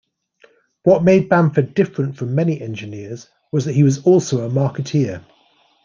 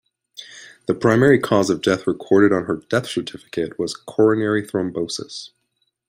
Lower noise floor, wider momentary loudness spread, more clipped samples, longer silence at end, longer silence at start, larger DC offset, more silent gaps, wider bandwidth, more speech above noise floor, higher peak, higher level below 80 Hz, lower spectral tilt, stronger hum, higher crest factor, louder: second, -57 dBFS vs -71 dBFS; about the same, 17 LU vs 18 LU; neither; about the same, 0.65 s vs 0.6 s; first, 0.85 s vs 0.4 s; neither; neither; second, 7.4 kHz vs 16 kHz; second, 41 dB vs 52 dB; about the same, -2 dBFS vs -2 dBFS; about the same, -58 dBFS vs -58 dBFS; first, -7.5 dB/octave vs -5.5 dB/octave; neither; about the same, 16 dB vs 18 dB; about the same, -17 LUFS vs -19 LUFS